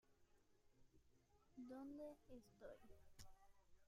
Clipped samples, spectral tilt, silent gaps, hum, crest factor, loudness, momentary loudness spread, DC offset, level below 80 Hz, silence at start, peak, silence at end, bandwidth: under 0.1%; -5.5 dB/octave; none; none; 18 dB; -61 LUFS; 12 LU; under 0.1%; -76 dBFS; 0.05 s; -44 dBFS; 0 s; 15 kHz